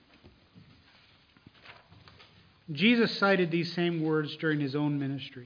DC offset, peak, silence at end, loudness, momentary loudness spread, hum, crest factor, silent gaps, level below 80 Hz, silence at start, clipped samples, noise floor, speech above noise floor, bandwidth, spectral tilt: under 0.1%; -12 dBFS; 0 s; -28 LUFS; 8 LU; none; 18 dB; none; -72 dBFS; 0.25 s; under 0.1%; -61 dBFS; 33 dB; 5.2 kHz; -7.5 dB/octave